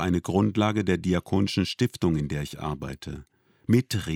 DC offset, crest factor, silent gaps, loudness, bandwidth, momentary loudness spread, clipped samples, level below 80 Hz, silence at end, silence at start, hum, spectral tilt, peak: under 0.1%; 18 dB; none; -26 LUFS; 17 kHz; 13 LU; under 0.1%; -48 dBFS; 0 s; 0 s; none; -6.5 dB/octave; -8 dBFS